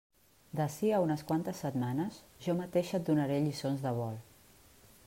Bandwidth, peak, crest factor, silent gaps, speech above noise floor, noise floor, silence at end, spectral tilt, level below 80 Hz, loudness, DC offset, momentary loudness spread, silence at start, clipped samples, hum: 16 kHz; -18 dBFS; 16 dB; none; 28 dB; -61 dBFS; 0.85 s; -7 dB/octave; -68 dBFS; -34 LUFS; under 0.1%; 10 LU; 0.55 s; under 0.1%; none